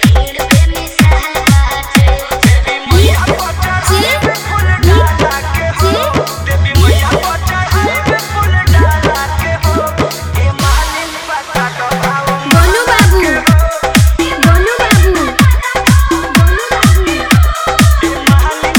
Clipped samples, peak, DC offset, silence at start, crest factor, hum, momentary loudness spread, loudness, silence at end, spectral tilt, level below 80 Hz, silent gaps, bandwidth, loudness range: 0.4%; 0 dBFS; under 0.1%; 0 s; 10 dB; none; 6 LU; -10 LUFS; 0 s; -5 dB/octave; -16 dBFS; none; over 20 kHz; 3 LU